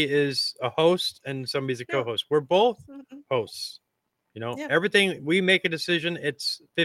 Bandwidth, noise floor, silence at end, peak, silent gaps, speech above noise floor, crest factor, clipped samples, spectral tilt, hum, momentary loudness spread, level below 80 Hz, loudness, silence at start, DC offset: 16 kHz; -78 dBFS; 0 s; -6 dBFS; none; 53 dB; 20 dB; under 0.1%; -4.5 dB/octave; none; 14 LU; -72 dBFS; -25 LUFS; 0 s; under 0.1%